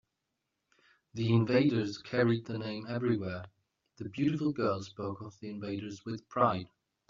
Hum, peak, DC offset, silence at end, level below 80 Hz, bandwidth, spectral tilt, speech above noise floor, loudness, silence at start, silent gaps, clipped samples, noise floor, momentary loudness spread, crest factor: none; -12 dBFS; under 0.1%; 0.45 s; -70 dBFS; 7.4 kHz; -6.5 dB/octave; 53 dB; -32 LUFS; 1.15 s; none; under 0.1%; -85 dBFS; 16 LU; 22 dB